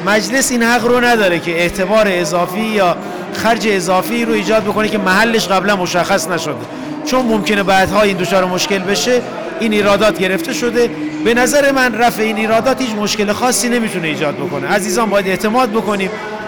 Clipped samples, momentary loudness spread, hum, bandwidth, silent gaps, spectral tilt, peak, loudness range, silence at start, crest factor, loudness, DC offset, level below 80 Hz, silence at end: under 0.1%; 6 LU; none; over 20 kHz; none; -3.5 dB/octave; -6 dBFS; 1 LU; 0 s; 8 dB; -14 LUFS; 0.5%; -44 dBFS; 0 s